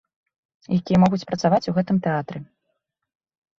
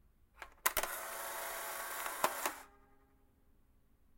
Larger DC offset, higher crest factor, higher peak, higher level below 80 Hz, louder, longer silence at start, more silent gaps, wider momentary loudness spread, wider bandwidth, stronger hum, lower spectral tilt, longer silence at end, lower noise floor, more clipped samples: neither; second, 18 dB vs 30 dB; first, -4 dBFS vs -12 dBFS; first, -54 dBFS vs -64 dBFS; first, -21 LUFS vs -39 LUFS; first, 0.7 s vs 0.35 s; neither; second, 10 LU vs 13 LU; second, 7.2 kHz vs 16.5 kHz; neither; first, -7.5 dB/octave vs 0 dB/octave; second, 1.15 s vs 1.4 s; first, -76 dBFS vs -69 dBFS; neither